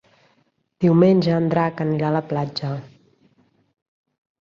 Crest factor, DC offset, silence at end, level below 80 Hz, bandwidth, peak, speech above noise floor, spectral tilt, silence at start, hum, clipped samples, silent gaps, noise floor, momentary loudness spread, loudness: 18 dB; under 0.1%; 1.55 s; -60 dBFS; 6.8 kHz; -4 dBFS; 46 dB; -9 dB/octave; 0.8 s; none; under 0.1%; none; -65 dBFS; 12 LU; -20 LUFS